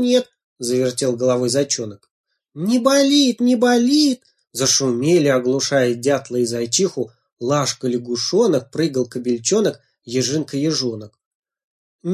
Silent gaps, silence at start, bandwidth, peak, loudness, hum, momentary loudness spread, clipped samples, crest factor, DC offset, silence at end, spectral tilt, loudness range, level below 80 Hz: 0.44-0.56 s, 2.11-2.24 s, 7.33-7.37 s, 11.26-11.42 s, 11.64-11.99 s; 0 s; 15 kHz; -2 dBFS; -18 LUFS; none; 12 LU; under 0.1%; 16 dB; under 0.1%; 0 s; -4 dB/octave; 4 LU; -64 dBFS